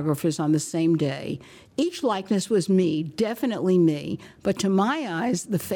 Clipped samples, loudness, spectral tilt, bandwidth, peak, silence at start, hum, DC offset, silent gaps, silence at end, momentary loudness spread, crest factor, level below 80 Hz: under 0.1%; -24 LUFS; -6 dB/octave; 19.5 kHz; -10 dBFS; 0 s; none; under 0.1%; none; 0 s; 9 LU; 12 dB; -62 dBFS